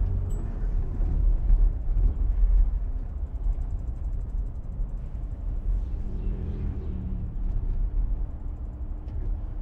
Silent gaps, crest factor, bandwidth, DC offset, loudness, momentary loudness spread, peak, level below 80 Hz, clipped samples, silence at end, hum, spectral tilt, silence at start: none; 14 dB; 1.9 kHz; under 0.1%; -32 LUFS; 10 LU; -10 dBFS; -26 dBFS; under 0.1%; 0 s; none; -10 dB/octave; 0 s